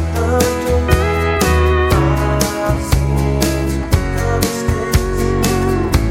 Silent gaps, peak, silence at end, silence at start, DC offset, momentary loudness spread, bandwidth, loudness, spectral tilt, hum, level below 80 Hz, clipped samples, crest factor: none; 0 dBFS; 0 s; 0 s; under 0.1%; 4 LU; 16.5 kHz; -16 LUFS; -5.5 dB/octave; none; -20 dBFS; under 0.1%; 14 dB